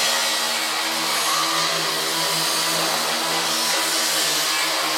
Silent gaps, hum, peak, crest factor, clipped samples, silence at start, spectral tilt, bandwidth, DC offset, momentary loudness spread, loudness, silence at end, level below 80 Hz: none; none; -8 dBFS; 14 dB; under 0.1%; 0 s; 0 dB/octave; 16.5 kHz; under 0.1%; 2 LU; -19 LUFS; 0 s; -76 dBFS